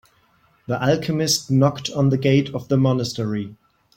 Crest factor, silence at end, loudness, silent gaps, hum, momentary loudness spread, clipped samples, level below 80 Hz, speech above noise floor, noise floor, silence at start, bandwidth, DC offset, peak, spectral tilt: 16 dB; 0.45 s; -20 LUFS; none; none; 9 LU; under 0.1%; -56 dBFS; 40 dB; -60 dBFS; 0.7 s; 16.5 kHz; under 0.1%; -4 dBFS; -5.5 dB/octave